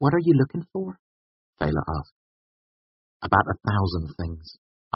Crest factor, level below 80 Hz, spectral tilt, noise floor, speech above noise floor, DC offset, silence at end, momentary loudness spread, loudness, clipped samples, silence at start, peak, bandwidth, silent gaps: 24 dB; -44 dBFS; -6.5 dB/octave; under -90 dBFS; over 66 dB; under 0.1%; 0.45 s; 15 LU; -25 LUFS; under 0.1%; 0 s; -2 dBFS; 5.8 kHz; 0.99-1.53 s, 2.12-3.20 s